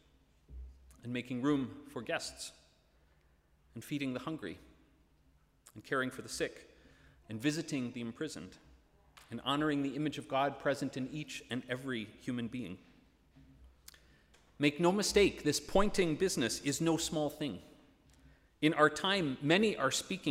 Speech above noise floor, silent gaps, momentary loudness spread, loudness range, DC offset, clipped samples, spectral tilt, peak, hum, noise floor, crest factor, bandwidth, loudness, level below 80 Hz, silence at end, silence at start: 35 dB; none; 18 LU; 11 LU; under 0.1%; under 0.1%; -4 dB/octave; -14 dBFS; none; -69 dBFS; 22 dB; 16 kHz; -34 LUFS; -56 dBFS; 0 s; 0.5 s